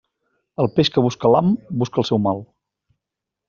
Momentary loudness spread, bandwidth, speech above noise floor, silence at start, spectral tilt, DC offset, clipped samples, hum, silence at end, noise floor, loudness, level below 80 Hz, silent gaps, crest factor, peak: 7 LU; 7.4 kHz; 66 dB; 0.6 s; -6 dB/octave; under 0.1%; under 0.1%; none; 1.05 s; -84 dBFS; -19 LUFS; -56 dBFS; none; 18 dB; -2 dBFS